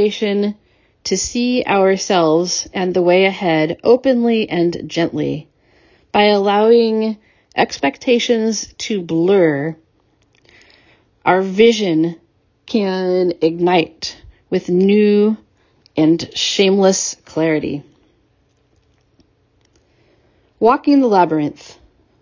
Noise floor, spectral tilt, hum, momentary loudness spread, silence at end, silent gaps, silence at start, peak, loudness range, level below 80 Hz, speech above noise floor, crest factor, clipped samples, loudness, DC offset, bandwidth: -59 dBFS; -4.5 dB/octave; none; 10 LU; 0.5 s; none; 0 s; 0 dBFS; 4 LU; -54 dBFS; 44 dB; 16 dB; under 0.1%; -16 LUFS; under 0.1%; 7.6 kHz